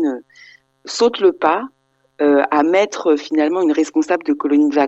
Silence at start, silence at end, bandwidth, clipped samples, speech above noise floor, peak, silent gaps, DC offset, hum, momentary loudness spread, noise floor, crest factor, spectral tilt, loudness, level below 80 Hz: 0 s; 0 s; 8.2 kHz; under 0.1%; 31 dB; 0 dBFS; none; under 0.1%; none; 8 LU; -47 dBFS; 16 dB; -4 dB/octave; -16 LUFS; -62 dBFS